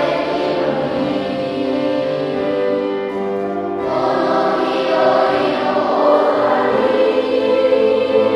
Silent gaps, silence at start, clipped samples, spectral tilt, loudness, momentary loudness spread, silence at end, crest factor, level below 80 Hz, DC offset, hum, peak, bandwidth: none; 0 s; under 0.1%; -6.5 dB/octave; -16 LUFS; 7 LU; 0 s; 14 dB; -54 dBFS; under 0.1%; none; 0 dBFS; 9.6 kHz